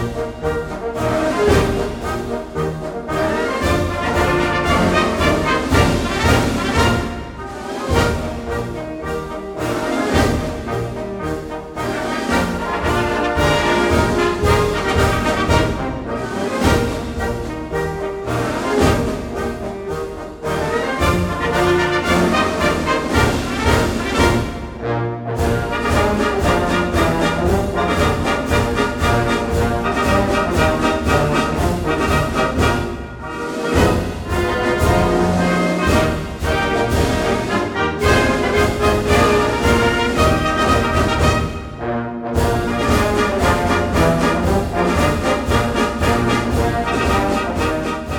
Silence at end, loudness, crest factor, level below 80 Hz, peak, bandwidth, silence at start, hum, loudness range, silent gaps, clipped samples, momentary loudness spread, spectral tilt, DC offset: 0 s; -18 LUFS; 16 dB; -28 dBFS; 0 dBFS; 19 kHz; 0 s; none; 5 LU; none; under 0.1%; 9 LU; -5.5 dB/octave; under 0.1%